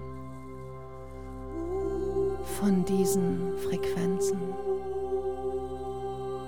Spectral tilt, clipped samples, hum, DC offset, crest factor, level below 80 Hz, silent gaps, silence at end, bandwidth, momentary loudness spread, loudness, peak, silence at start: -6.5 dB/octave; under 0.1%; none; 0.7%; 16 dB; -48 dBFS; none; 0 s; 18 kHz; 17 LU; -30 LUFS; -14 dBFS; 0 s